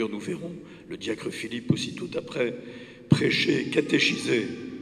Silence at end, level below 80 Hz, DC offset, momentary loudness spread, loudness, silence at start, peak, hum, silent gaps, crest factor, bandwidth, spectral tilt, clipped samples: 0 s; -64 dBFS; under 0.1%; 17 LU; -26 LUFS; 0 s; -4 dBFS; none; none; 22 dB; 13.5 kHz; -5 dB/octave; under 0.1%